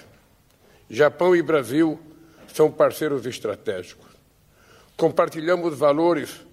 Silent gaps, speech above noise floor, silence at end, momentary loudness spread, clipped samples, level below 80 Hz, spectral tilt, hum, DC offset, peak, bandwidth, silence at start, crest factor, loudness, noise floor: none; 36 dB; 0.15 s; 15 LU; under 0.1%; -64 dBFS; -6 dB/octave; none; under 0.1%; -6 dBFS; 15.5 kHz; 0.9 s; 18 dB; -21 LUFS; -57 dBFS